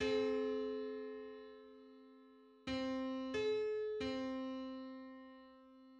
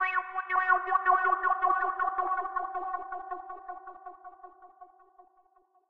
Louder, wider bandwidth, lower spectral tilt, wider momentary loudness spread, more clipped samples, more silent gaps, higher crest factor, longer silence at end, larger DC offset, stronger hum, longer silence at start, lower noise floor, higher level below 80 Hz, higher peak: second, -42 LUFS vs -29 LUFS; first, 8.6 kHz vs 5 kHz; about the same, -5 dB/octave vs -4.5 dB/octave; about the same, 22 LU vs 21 LU; neither; neither; about the same, 16 dB vs 18 dB; second, 0 s vs 1.05 s; neither; neither; about the same, 0 s vs 0 s; about the same, -63 dBFS vs -66 dBFS; about the same, -70 dBFS vs -68 dBFS; second, -28 dBFS vs -12 dBFS